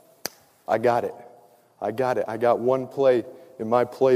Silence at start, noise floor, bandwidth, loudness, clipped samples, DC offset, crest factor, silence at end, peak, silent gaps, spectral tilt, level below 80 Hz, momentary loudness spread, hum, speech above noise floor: 0.25 s; -54 dBFS; 15.5 kHz; -24 LUFS; under 0.1%; under 0.1%; 18 dB; 0 s; -6 dBFS; none; -6 dB/octave; -72 dBFS; 15 LU; none; 32 dB